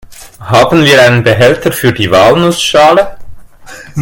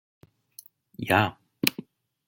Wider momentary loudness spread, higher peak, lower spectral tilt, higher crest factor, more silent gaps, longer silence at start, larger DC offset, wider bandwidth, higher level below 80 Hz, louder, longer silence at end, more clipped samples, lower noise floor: second, 6 LU vs 25 LU; about the same, 0 dBFS vs 0 dBFS; about the same, -5 dB/octave vs -4 dB/octave; second, 8 dB vs 30 dB; neither; second, 0.1 s vs 1 s; neither; about the same, 17.5 kHz vs 17 kHz; first, -36 dBFS vs -66 dBFS; first, -7 LUFS vs -26 LUFS; second, 0 s vs 0.45 s; first, 2% vs under 0.1%; second, -30 dBFS vs -53 dBFS